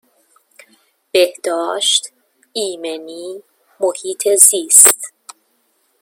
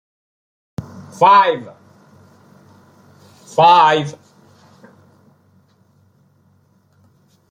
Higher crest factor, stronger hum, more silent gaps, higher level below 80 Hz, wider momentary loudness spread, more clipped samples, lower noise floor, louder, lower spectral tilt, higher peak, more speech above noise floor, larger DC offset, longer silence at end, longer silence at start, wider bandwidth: about the same, 18 dB vs 18 dB; neither; neither; second, -70 dBFS vs -64 dBFS; about the same, 23 LU vs 24 LU; first, 0.3% vs under 0.1%; first, -62 dBFS vs -56 dBFS; about the same, -12 LUFS vs -13 LUFS; second, 1 dB/octave vs -5 dB/octave; about the same, 0 dBFS vs 0 dBFS; first, 48 dB vs 44 dB; neither; second, 0.95 s vs 3.4 s; first, 1.15 s vs 0.8 s; first, 17 kHz vs 10.5 kHz